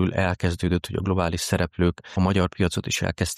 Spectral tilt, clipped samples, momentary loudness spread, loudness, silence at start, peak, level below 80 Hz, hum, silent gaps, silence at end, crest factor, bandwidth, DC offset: -5.5 dB/octave; under 0.1%; 3 LU; -24 LUFS; 0 s; -8 dBFS; -40 dBFS; none; none; 0 s; 16 dB; 15 kHz; under 0.1%